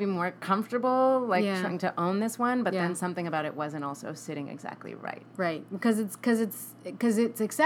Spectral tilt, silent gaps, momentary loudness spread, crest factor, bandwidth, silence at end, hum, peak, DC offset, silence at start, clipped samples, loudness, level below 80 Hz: -5.5 dB/octave; none; 14 LU; 18 dB; 18 kHz; 0 s; none; -10 dBFS; under 0.1%; 0 s; under 0.1%; -29 LUFS; -88 dBFS